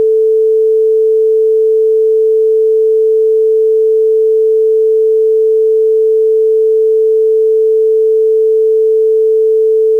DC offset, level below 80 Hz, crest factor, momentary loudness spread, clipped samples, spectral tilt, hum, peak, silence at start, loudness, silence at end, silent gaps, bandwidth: 0.4%; -78 dBFS; 4 dB; 0 LU; under 0.1%; -5 dB/octave; none; -6 dBFS; 0 s; -10 LUFS; 0 s; none; 0.5 kHz